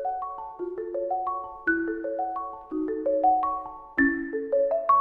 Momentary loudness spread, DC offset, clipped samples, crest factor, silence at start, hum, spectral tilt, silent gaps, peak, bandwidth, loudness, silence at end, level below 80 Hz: 11 LU; under 0.1%; under 0.1%; 16 dB; 0 s; none; -8.5 dB/octave; none; -10 dBFS; 4.1 kHz; -27 LUFS; 0 s; -56 dBFS